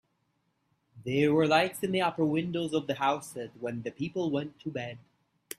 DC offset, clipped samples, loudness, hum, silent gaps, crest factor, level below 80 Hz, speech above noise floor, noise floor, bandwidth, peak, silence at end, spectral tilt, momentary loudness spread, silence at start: under 0.1%; under 0.1%; -30 LUFS; none; none; 22 dB; -68 dBFS; 46 dB; -76 dBFS; 15.5 kHz; -10 dBFS; 0.6 s; -5.5 dB/octave; 13 LU; 0.95 s